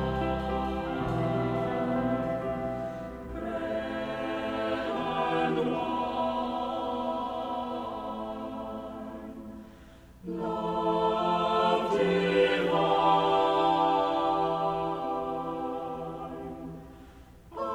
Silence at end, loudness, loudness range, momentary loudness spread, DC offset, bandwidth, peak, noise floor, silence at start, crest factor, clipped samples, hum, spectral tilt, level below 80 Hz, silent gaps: 0 s; -29 LUFS; 10 LU; 15 LU; under 0.1%; 16 kHz; -12 dBFS; -51 dBFS; 0 s; 18 dB; under 0.1%; 60 Hz at -55 dBFS; -7 dB/octave; -50 dBFS; none